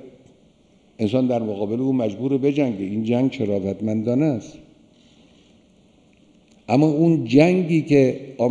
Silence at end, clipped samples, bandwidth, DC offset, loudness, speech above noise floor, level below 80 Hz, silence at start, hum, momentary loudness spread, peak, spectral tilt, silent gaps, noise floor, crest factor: 0 s; under 0.1%; 9.8 kHz; under 0.1%; -20 LUFS; 36 dB; -58 dBFS; 0 s; none; 8 LU; -2 dBFS; -8 dB/octave; none; -56 dBFS; 20 dB